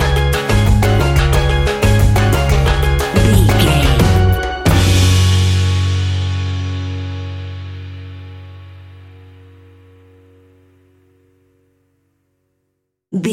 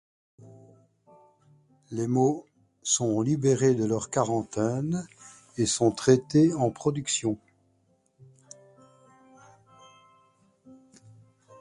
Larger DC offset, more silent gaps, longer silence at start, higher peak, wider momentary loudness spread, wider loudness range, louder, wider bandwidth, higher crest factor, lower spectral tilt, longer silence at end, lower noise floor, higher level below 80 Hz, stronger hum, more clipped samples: neither; neither; second, 0 s vs 0.45 s; first, 0 dBFS vs -6 dBFS; first, 18 LU vs 13 LU; first, 18 LU vs 7 LU; first, -14 LUFS vs -26 LUFS; first, 16.5 kHz vs 11.5 kHz; second, 14 dB vs 22 dB; about the same, -5.5 dB/octave vs -5.5 dB/octave; second, 0 s vs 0.85 s; about the same, -71 dBFS vs -68 dBFS; first, -20 dBFS vs -62 dBFS; neither; neither